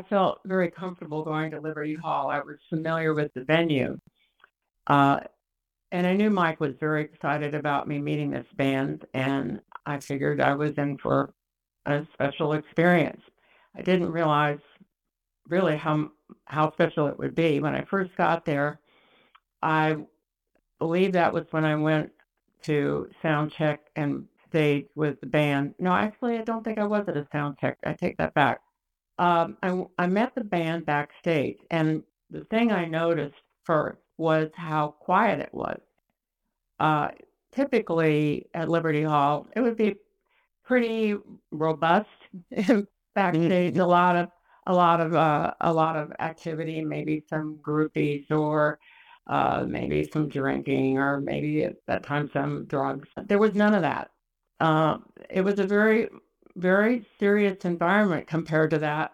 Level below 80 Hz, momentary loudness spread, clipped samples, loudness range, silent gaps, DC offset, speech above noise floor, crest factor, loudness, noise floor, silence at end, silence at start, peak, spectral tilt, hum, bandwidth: -62 dBFS; 10 LU; under 0.1%; 4 LU; none; under 0.1%; 59 dB; 20 dB; -26 LUFS; -84 dBFS; 0.05 s; 0 s; -6 dBFS; -7.5 dB/octave; none; 13 kHz